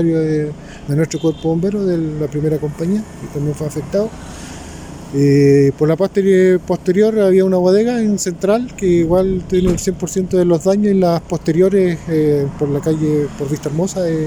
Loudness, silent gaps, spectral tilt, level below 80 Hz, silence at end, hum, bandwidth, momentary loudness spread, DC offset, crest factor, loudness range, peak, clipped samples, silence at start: -15 LUFS; none; -7 dB/octave; -38 dBFS; 0 s; none; 16 kHz; 10 LU; under 0.1%; 12 dB; 6 LU; -2 dBFS; under 0.1%; 0 s